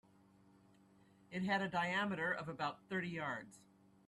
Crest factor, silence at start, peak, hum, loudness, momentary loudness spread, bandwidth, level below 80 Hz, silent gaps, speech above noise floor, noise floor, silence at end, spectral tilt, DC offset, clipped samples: 18 dB; 1.3 s; -24 dBFS; none; -40 LUFS; 10 LU; 12 kHz; -78 dBFS; none; 28 dB; -68 dBFS; 0.5 s; -5.5 dB/octave; under 0.1%; under 0.1%